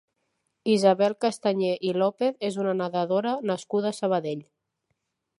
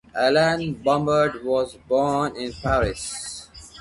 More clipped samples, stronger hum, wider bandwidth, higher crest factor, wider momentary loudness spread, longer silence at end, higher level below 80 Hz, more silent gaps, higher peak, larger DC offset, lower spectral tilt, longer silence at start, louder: neither; neither; about the same, 11.5 kHz vs 11.5 kHz; about the same, 20 dB vs 16 dB; second, 7 LU vs 12 LU; first, 0.95 s vs 0 s; second, -80 dBFS vs -42 dBFS; neither; about the same, -8 dBFS vs -6 dBFS; neither; first, -6 dB/octave vs -4.5 dB/octave; first, 0.65 s vs 0.15 s; second, -25 LUFS vs -22 LUFS